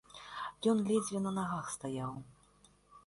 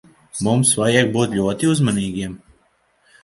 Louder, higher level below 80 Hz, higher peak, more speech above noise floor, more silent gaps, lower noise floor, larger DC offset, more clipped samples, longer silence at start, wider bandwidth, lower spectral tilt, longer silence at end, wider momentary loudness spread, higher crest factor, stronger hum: second, -36 LUFS vs -18 LUFS; second, -70 dBFS vs -50 dBFS; second, -20 dBFS vs 0 dBFS; second, 31 dB vs 43 dB; neither; first, -66 dBFS vs -61 dBFS; neither; neither; second, 0.1 s vs 0.35 s; about the same, 11.5 kHz vs 11.5 kHz; about the same, -5.5 dB/octave vs -4.5 dB/octave; second, 0.1 s vs 0.85 s; about the same, 12 LU vs 12 LU; about the same, 18 dB vs 18 dB; first, 50 Hz at -60 dBFS vs none